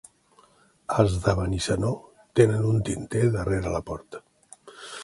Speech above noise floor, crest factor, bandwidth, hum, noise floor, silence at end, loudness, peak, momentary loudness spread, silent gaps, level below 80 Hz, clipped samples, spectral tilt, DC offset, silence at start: 36 dB; 22 dB; 11.5 kHz; none; -59 dBFS; 0 s; -25 LUFS; -4 dBFS; 19 LU; none; -42 dBFS; under 0.1%; -6.5 dB/octave; under 0.1%; 0.9 s